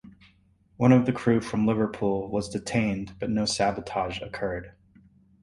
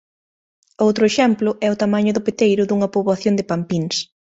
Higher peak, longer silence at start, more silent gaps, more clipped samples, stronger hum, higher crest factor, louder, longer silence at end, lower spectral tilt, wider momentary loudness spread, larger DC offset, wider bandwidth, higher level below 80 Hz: second, -6 dBFS vs -2 dBFS; second, 0.05 s vs 0.8 s; neither; neither; neither; about the same, 20 dB vs 16 dB; second, -26 LUFS vs -18 LUFS; first, 0.75 s vs 0.3 s; about the same, -6 dB/octave vs -5.5 dB/octave; first, 11 LU vs 6 LU; neither; first, 11.5 kHz vs 8 kHz; first, -52 dBFS vs -60 dBFS